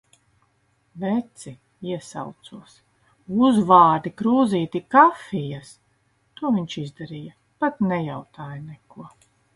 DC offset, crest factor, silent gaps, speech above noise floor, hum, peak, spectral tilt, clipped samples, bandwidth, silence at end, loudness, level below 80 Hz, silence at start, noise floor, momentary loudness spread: under 0.1%; 22 dB; none; 44 dB; none; -2 dBFS; -6.5 dB/octave; under 0.1%; 11.5 kHz; 0.45 s; -21 LUFS; -64 dBFS; 0.95 s; -66 dBFS; 23 LU